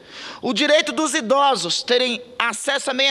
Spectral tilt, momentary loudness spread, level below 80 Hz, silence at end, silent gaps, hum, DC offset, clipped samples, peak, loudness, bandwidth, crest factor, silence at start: -1.5 dB/octave; 7 LU; -70 dBFS; 0 s; none; none; under 0.1%; under 0.1%; 0 dBFS; -19 LUFS; 14 kHz; 20 dB; 0.1 s